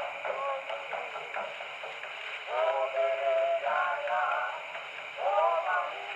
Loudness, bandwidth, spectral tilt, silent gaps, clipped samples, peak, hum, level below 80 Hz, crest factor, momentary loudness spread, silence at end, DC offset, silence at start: -31 LUFS; 8.6 kHz; -1.5 dB/octave; none; under 0.1%; -14 dBFS; none; -86 dBFS; 18 dB; 11 LU; 0 s; under 0.1%; 0 s